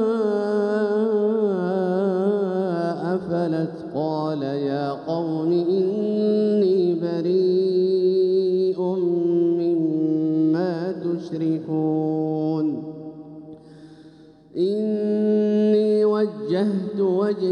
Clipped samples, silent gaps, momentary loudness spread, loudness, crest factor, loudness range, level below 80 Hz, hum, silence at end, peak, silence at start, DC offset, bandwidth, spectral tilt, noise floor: under 0.1%; none; 7 LU; -22 LUFS; 12 dB; 6 LU; -72 dBFS; none; 0 s; -10 dBFS; 0 s; under 0.1%; 9 kHz; -9 dB/octave; -48 dBFS